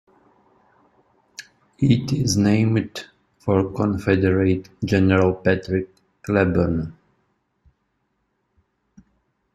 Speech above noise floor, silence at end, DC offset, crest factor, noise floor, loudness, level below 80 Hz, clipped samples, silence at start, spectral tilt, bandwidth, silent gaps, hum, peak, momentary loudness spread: 52 dB; 2.65 s; under 0.1%; 20 dB; -71 dBFS; -20 LUFS; -50 dBFS; under 0.1%; 1.4 s; -6.5 dB/octave; 13.5 kHz; none; none; -4 dBFS; 19 LU